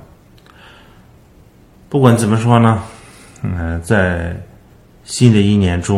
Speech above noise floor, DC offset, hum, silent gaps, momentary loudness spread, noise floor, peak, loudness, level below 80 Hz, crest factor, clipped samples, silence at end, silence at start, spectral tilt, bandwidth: 32 dB; under 0.1%; none; none; 15 LU; -45 dBFS; 0 dBFS; -14 LUFS; -36 dBFS; 16 dB; 0.1%; 0 s; 1.9 s; -6.5 dB/octave; 13 kHz